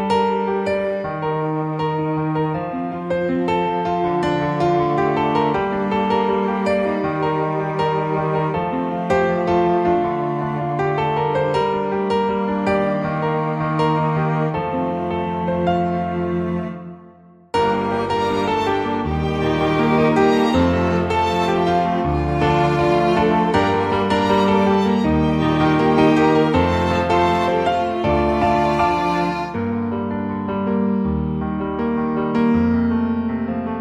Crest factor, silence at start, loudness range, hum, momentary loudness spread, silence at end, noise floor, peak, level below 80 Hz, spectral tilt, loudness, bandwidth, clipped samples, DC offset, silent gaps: 14 dB; 0 s; 5 LU; none; 6 LU; 0 s; -46 dBFS; -4 dBFS; -38 dBFS; -7.5 dB/octave; -19 LUFS; 10.5 kHz; under 0.1%; under 0.1%; none